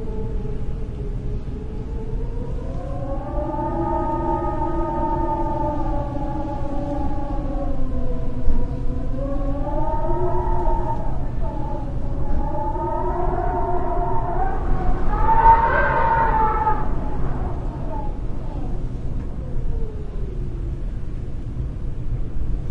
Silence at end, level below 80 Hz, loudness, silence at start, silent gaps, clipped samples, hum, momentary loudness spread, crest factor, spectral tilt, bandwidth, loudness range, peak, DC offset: 0 s; -24 dBFS; -25 LUFS; 0 s; none; under 0.1%; none; 11 LU; 18 dB; -9 dB/octave; 4 kHz; 11 LU; -2 dBFS; under 0.1%